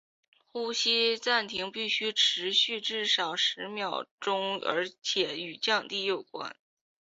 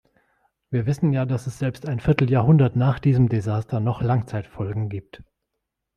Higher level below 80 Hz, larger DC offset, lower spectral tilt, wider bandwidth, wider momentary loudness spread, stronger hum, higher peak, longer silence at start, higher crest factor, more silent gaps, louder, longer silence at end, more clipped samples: second, -78 dBFS vs -48 dBFS; neither; second, -1.5 dB/octave vs -9 dB/octave; second, 8 kHz vs 9.8 kHz; about the same, 10 LU vs 12 LU; neither; second, -12 dBFS vs -2 dBFS; second, 0.55 s vs 0.7 s; about the same, 20 dB vs 20 dB; first, 4.11-4.18 s vs none; second, -28 LUFS vs -22 LUFS; second, 0.5 s vs 0.75 s; neither